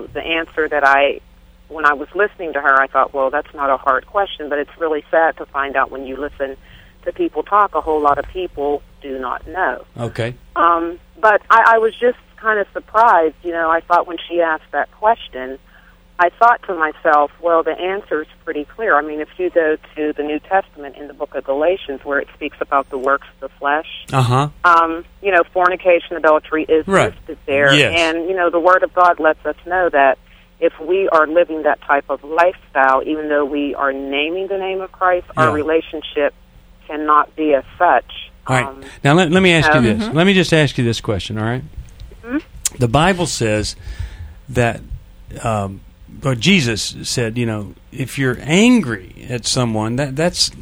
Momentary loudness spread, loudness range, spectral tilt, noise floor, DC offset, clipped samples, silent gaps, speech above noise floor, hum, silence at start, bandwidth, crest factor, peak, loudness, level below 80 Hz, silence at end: 14 LU; 5 LU; -5 dB/octave; -46 dBFS; under 0.1%; under 0.1%; none; 30 dB; none; 0 s; over 20 kHz; 16 dB; 0 dBFS; -16 LUFS; -42 dBFS; 0 s